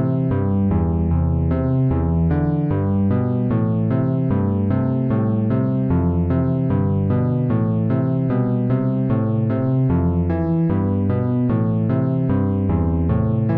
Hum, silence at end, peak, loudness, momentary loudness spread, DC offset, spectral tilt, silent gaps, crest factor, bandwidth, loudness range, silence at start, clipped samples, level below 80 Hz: none; 0 s; -8 dBFS; -19 LUFS; 1 LU; under 0.1%; -13.5 dB/octave; none; 10 dB; 3.7 kHz; 0 LU; 0 s; under 0.1%; -34 dBFS